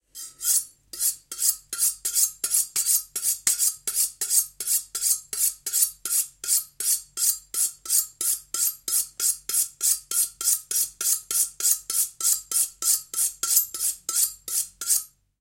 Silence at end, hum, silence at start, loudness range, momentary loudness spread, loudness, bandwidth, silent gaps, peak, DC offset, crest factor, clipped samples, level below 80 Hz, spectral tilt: 0.35 s; none; 0.15 s; 1 LU; 4 LU; -22 LUFS; 17 kHz; none; -4 dBFS; under 0.1%; 22 dB; under 0.1%; -64 dBFS; 3.5 dB/octave